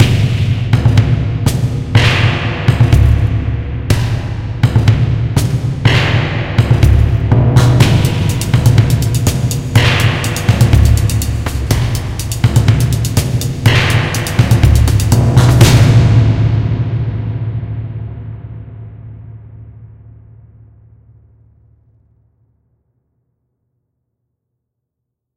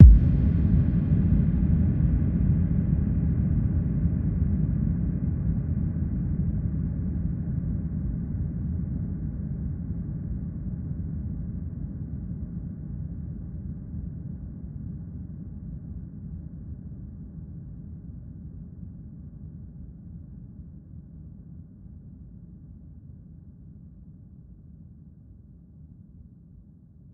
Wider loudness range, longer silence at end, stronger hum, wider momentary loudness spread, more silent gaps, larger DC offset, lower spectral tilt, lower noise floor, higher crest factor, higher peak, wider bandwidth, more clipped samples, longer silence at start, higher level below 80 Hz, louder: second, 9 LU vs 23 LU; first, 5.5 s vs 0 s; neither; second, 11 LU vs 23 LU; neither; neither; second, -6 dB/octave vs -13 dB/octave; first, -76 dBFS vs -51 dBFS; second, 12 dB vs 26 dB; about the same, 0 dBFS vs 0 dBFS; first, 16.5 kHz vs 2.6 kHz; first, 0.5% vs under 0.1%; about the same, 0 s vs 0 s; first, -22 dBFS vs -30 dBFS; first, -12 LUFS vs -28 LUFS